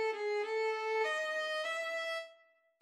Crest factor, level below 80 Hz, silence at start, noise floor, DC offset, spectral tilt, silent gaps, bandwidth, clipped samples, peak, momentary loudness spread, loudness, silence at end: 12 dB; under -90 dBFS; 0 s; -67 dBFS; under 0.1%; 1.5 dB/octave; none; 13 kHz; under 0.1%; -24 dBFS; 6 LU; -35 LUFS; 0.5 s